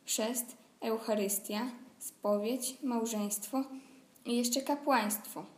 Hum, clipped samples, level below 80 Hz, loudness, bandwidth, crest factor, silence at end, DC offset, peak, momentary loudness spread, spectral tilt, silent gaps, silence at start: none; under 0.1%; -90 dBFS; -34 LUFS; 15.5 kHz; 20 dB; 0.05 s; under 0.1%; -16 dBFS; 13 LU; -3 dB/octave; none; 0.05 s